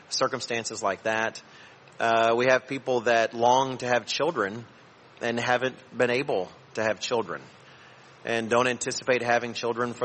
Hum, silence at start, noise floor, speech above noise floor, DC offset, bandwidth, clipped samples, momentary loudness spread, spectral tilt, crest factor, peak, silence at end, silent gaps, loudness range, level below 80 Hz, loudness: none; 0.1 s; -51 dBFS; 25 dB; under 0.1%; 8.8 kHz; under 0.1%; 9 LU; -3.5 dB/octave; 18 dB; -8 dBFS; 0 s; none; 4 LU; -70 dBFS; -26 LUFS